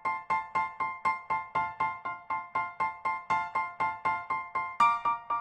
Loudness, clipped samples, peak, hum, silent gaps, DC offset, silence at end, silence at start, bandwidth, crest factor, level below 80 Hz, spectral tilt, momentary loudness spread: -31 LUFS; under 0.1%; -12 dBFS; none; none; under 0.1%; 0 s; 0 s; 9.6 kHz; 18 dB; -66 dBFS; -4 dB/octave; 8 LU